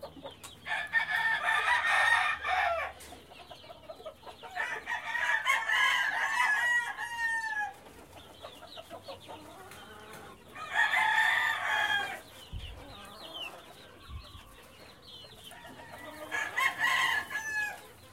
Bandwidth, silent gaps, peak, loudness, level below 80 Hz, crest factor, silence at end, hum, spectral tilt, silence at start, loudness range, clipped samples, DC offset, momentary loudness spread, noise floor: 16 kHz; none; -14 dBFS; -29 LUFS; -60 dBFS; 20 dB; 0 s; none; -1 dB/octave; 0 s; 15 LU; under 0.1%; under 0.1%; 23 LU; -53 dBFS